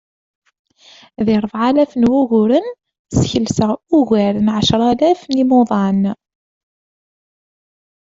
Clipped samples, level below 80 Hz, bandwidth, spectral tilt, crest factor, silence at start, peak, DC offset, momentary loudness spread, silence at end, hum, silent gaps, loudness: under 0.1%; -46 dBFS; 7.8 kHz; -6.5 dB/octave; 16 dB; 1.2 s; 0 dBFS; under 0.1%; 5 LU; 2.05 s; none; 2.99-3.05 s; -15 LUFS